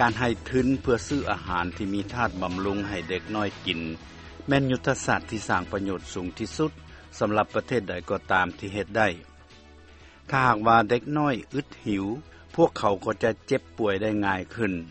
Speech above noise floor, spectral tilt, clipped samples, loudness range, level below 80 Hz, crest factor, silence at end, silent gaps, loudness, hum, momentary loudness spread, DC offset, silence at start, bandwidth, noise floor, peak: 24 dB; -5.5 dB/octave; under 0.1%; 3 LU; -48 dBFS; 22 dB; 0 s; none; -26 LUFS; none; 10 LU; under 0.1%; 0 s; 8.4 kHz; -50 dBFS; -4 dBFS